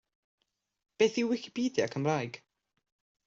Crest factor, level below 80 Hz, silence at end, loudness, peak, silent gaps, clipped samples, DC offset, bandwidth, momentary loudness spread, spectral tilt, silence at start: 20 dB; -76 dBFS; 0.9 s; -31 LUFS; -14 dBFS; none; under 0.1%; under 0.1%; 7.8 kHz; 9 LU; -5 dB/octave; 1 s